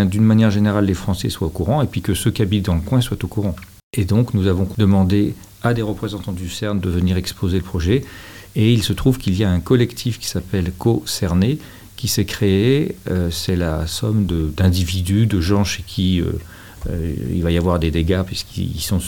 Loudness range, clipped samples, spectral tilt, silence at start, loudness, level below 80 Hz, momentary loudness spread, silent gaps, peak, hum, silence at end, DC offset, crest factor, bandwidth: 2 LU; under 0.1%; -6 dB/octave; 0 s; -19 LUFS; -36 dBFS; 9 LU; 3.83-3.91 s; -2 dBFS; none; 0 s; 0.4%; 16 dB; 18 kHz